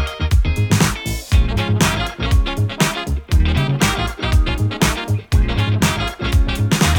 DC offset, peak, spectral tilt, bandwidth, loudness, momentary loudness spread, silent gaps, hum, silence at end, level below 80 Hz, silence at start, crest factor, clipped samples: under 0.1%; -2 dBFS; -5 dB/octave; 19 kHz; -18 LUFS; 4 LU; none; none; 0 s; -20 dBFS; 0 s; 14 dB; under 0.1%